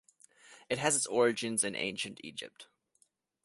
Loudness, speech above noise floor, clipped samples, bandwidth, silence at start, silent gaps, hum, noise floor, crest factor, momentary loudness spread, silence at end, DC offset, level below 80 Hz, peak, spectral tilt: -32 LUFS; 40 dB; under 0.1%; 12 kHz; 0.5 s; none; none; -73 dBFS; 22 dB; 15 LU; 0.8 s; under 0.1%; -74 dBFS; -14 dBFS; -2.5 dB/octave